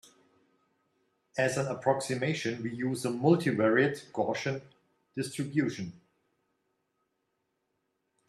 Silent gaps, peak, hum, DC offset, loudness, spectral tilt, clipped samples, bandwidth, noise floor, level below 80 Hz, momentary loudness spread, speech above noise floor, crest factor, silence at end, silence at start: none; -12 dBFS; none; under 0.1%; -30 LUFS; -5.5 dB/octave; under 0.1%; 13 kHz; -80 dBFS; -74 dBFS; 13 LU; 50 dB; 22 dB; 2.3 s; 1.35 s